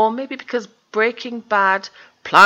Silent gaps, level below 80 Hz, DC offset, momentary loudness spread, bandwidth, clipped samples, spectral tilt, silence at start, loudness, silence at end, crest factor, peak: none; -72 dBFS; under 0.1%; 13 LU; 14 kHz; 0.3%; -3.5 dB/octave; 0 s; -20 LUFS; 0 s; 18 dB; 0 dBFS